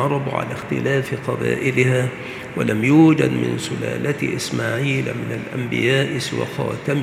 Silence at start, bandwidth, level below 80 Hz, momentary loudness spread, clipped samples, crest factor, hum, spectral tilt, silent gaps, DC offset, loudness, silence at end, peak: 0 s; 15 kHz; -56 dBFS; 10 LU; under 0.1%; 18 dB; none; -6 dB/octave; none; under 0.1%; -20 LUFS; 0 s; -2 dBFS